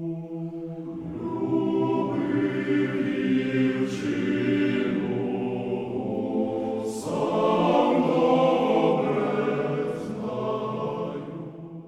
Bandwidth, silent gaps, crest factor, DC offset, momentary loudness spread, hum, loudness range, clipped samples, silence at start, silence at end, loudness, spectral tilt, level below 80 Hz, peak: 12 kHz; none; 16 dB; under 0.1%; 12 LU; none; 4 LU; under 0.1%; 0 s; 0 s; -26 LUFS; -7 dB/octave; -62 dBFS; -8 dBFS